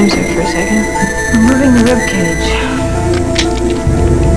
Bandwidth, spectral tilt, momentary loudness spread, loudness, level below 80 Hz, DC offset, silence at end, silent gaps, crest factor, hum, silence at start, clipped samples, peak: 11 kHz; -5 dB/octave; 5 LU; -12 LUFS; -20 dBFS; 4%; 0 s; none; 12 dB; none; 0 s; under 0.1%; 0 dBFS